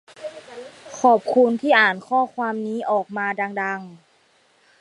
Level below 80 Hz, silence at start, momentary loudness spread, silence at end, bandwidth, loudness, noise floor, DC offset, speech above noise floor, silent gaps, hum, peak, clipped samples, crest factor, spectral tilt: -76 dBFS; 0.2 s; 21 LU; 0.85 s; 11 kHz; -20 LUFS; -60 dBFS; under 0.1%; 40 dB; none; none; -2 dBFS; under 0.1%; 20 dB; -4.5 dB/octave